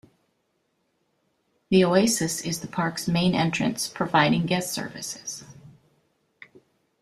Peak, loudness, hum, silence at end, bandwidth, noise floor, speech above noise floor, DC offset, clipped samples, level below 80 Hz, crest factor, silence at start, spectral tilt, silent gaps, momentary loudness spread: -6 dBFS; -24 LUFS; none; 1.3 s; 14 kHz; -73 dBFS; 49 dB; under 0.1%; under 0.1%; -60 dBFS; 20 dB; 1.7 s; -4.5 dB/octave; none; 13 LU